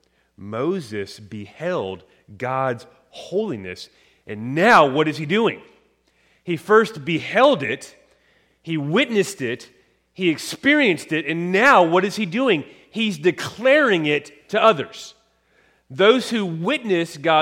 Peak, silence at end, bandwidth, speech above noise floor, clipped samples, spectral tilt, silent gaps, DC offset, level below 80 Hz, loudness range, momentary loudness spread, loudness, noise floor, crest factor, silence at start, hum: -2 dBFS; 0 s; 16.5 kHz; 42 dB; under 0.1%; -5 dB/octave; none; under 0.1%; -66 dBFS; 9 LU; 18 LU; -19 LUFS; -61 dBFS; 20 dB; 0.4 s; none